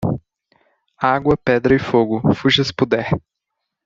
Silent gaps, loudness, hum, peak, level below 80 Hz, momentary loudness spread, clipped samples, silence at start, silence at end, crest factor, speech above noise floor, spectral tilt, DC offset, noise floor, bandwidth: none; -17 LUFS; none; -2 dBFS; -46 dBFS; 8 LU; under 0.1%; 0 s; 0.65 s; 16 dB; 62 dB; -6.5 dB/octave; under 0.1%; -78 dBFS; 7.6 kHz